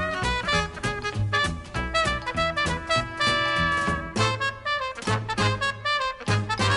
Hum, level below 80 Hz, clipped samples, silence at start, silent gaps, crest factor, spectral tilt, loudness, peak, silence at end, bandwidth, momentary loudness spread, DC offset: none; -40 dBFS; under 0.1%; 0 s; none; 18 dB; -4 dB/octave; -25 LUFS; -8 dBFS; 0 s; 11.5 kHz; 5 LU; under 0.1%